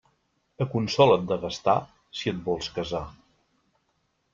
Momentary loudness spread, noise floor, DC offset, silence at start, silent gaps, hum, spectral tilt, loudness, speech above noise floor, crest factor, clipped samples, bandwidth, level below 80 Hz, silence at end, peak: 13 LU; -73 dBFS; under 0.1%; 0.6 s; none; none; -6 dB/octave; -26 LUFS; 48 dB; 22 dB; under 0.1%; 7.6 kHz; -56 dBFS; 1.2 s; -4 dBFS